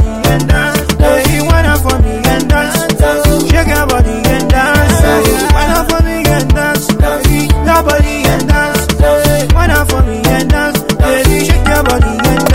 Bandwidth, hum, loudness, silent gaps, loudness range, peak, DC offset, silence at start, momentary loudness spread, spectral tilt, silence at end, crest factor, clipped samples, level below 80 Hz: 16.5 kHz; none; -10 LUFS; none; 1 LU; 0 dBFS; 2%; 0 s; 3 LU; -5 dB/octave; 0 s; 10 dB; 0.5%; -14 dBFS